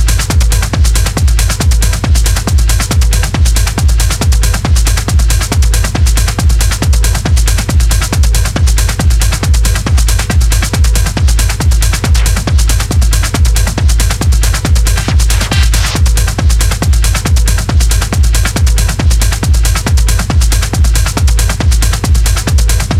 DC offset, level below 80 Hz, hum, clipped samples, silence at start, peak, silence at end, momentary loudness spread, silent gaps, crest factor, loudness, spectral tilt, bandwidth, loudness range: under 0.1%; -10 dBFS; none; under 0.1%; 0 s; 0 dBFS; 0 s; 1 LU; none; 8 dB; -11 LUFS; -4 dB/octave; 16 kHz; 0 LU